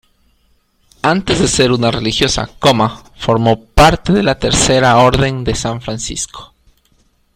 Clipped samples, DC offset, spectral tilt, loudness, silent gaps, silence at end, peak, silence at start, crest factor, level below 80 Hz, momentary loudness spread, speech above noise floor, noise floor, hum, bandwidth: under 0.1%; under 0.1%; -4 dB/octave; -13 LUFS; none; 0.9 s; 0 dBFS; 1.05 s; 14 dB; -28 dBFS; 11 LU; 44 dB; -56 dBFS; none; 16 kHz